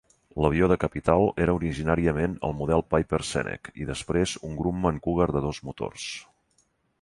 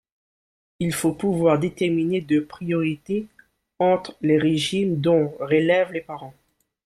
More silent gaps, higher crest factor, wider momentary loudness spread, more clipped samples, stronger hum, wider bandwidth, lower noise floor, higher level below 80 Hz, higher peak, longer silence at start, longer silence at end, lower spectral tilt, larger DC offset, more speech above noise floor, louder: neither; about the same, 20 dB vs 16 dB; first, 12 LU vs 9 LU; neither; neither; second, 11.5 kHz vs 15 kHz; second, -69 dBFS vs under -90 dBFS; first, -42 dBFS vs -60 dBFS; about the same, -6 dBFS vs -6 dBFS; second, 0.35 s vs 0.8 s; first, 0.8 s vs 0.55 s; about the same, -6 dB/octave vs -6 dB/octave; neither; second, 43 dB vs over 69 dB; second, -26 LUFS vs -22 LUFS